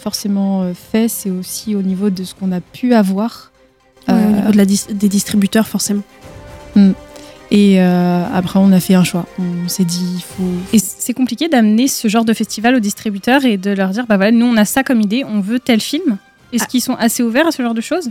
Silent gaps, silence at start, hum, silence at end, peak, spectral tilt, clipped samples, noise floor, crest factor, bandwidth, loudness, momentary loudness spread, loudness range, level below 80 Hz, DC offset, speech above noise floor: none; 0 s; none; 0 s; 0 dBFS; -5 dB/octave; under 0.1%; -49 dBFS; 14 dB; 17 kHz; -14 LUFS; 9 LU; 3 LU; -48 dBFS; under 0.1%; 36 dB